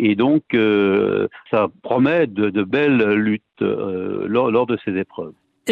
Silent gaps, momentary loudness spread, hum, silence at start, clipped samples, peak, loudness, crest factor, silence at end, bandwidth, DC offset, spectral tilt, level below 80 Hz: none; 9 LU; none; 0 s; under 0.1%; -4 dBFS; -19 LUFS; 14 dB; 0 s; 12 kHz; under 0.1%; -7.5 dB/octave; -60 dBFS